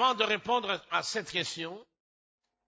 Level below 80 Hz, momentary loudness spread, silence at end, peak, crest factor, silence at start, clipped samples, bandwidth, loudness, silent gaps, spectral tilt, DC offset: -72 dBFS; 12 LU; 0.85 s; -12 dBFS; 20 dB; 0 s; under 0.1%; 8 kHz; -31 LUFS; none; -2.5 dB/octave; under 0.1%